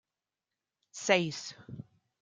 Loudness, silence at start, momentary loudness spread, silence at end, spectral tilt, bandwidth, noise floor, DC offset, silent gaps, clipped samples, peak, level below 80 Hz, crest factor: -31 LUFS; 0.95 s; 21 LU; 0.4 s; -3.5 dB/octave; 9.6 kHz; under -90 dBFS; under 0.1%; none; under 0.1%; -10 dBFS; -76 dBFS; 26 dB